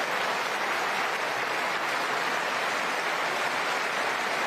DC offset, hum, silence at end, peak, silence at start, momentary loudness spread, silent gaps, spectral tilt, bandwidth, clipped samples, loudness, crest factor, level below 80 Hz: under 0.1%; none; 0 s; -16 dBFS; 0 s; 1 LU; none; -1.5 dB/octave; 14.5 kHz; under 0.1%; -27 LUFS; 12 dB; -76 dBFS